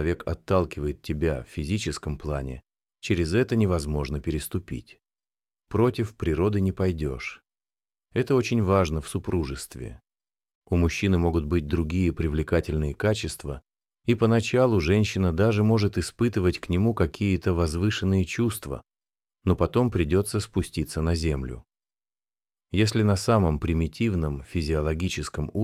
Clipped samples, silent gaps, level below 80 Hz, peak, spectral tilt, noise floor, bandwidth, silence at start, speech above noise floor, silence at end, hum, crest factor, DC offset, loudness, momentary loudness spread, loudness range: under 0.1%; 10.55-10.62 s; -38 dBFS; -8 dBFS; -6.5 dB/octave; under -90 dBFS; 15 kHz; 0 s; over 65 dB; 0 s; none; 18 dB; under 0.1%; -26 LUFS; 11 LU; 4 LU